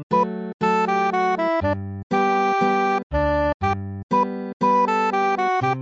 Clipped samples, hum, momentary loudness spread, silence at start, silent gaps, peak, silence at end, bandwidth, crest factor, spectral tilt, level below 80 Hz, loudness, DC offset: under 0.1%; none; 6 LU; 0 s; 0.03-0.10 s, 0.54-0.59 s, 2.03-2.10 s, 3.03-3.10 s, 3.54-3.60 s, 4.03-4.09 s, 4.53-4.60 s; -8 dBFS; 0 s; 8 kHz; 14 dB; -6.5 dB/octave; -40 dBFS; -21 LUFS; under 0.1%